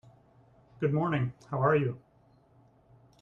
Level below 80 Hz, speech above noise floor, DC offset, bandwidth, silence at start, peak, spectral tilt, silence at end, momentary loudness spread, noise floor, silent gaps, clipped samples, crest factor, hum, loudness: -66 dBFS; 35 dB; under 0.1%; 6.8 kHz; 0.8 s; -14 dBFS; -9.5 dB/octave; 1.25 s; 8 LU; -63 dBFS; none; under 0.1%; 20 dB; none; -30 LUFS